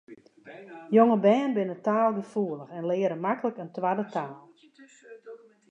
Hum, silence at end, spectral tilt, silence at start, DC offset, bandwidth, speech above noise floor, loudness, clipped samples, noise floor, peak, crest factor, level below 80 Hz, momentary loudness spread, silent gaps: none; 0.35 s; -8 dB/octave; 0.1 s; under 0.1%; 8 kHz; 30 dB; -26 LUFS; under 0.1%; -55 dBFS; -6 dBFS; 22 dB; -84 dBFS; 23 LU; none